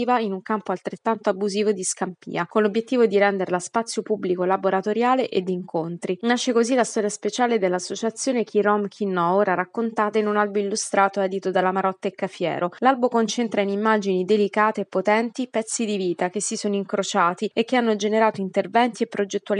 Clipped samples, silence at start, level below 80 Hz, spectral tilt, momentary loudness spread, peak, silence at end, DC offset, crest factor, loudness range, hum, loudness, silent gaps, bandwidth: under 0.1%; 0 s; -80 dBFS; -4.5 dB/octave; 6 LU; -4 dBFS; 0 s; under 0.1%; 18 dB; 1 LU; none; -22 LUFS; none; 11.5 kHz